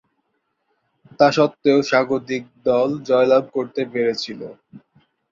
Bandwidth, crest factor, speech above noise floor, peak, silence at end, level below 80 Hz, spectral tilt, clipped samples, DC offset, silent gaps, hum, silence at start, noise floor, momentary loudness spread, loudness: 7.6 kHz; 18 dB; 53 dB; -2 dBFS; 0.55 s; -64 dBFS; -5.5 dB/octave; under 0.1%; under 0.1%; none; none; 1.2 s; -72 dBFS; 12 LU; -19 LUFS